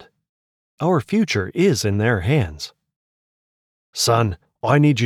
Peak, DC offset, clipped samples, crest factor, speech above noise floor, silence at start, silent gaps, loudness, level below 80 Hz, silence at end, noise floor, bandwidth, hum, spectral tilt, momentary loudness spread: -4 dBFS; under 0.1%; under 0.1%; 16 dB; over 72 dB; 0.8 s; 2.96-3.93 s; -19 LUFS; -46 dBFS; 0 s; under -90 dBFS; 15.5 kHz; none; -5.5 dB/octave; 10 LU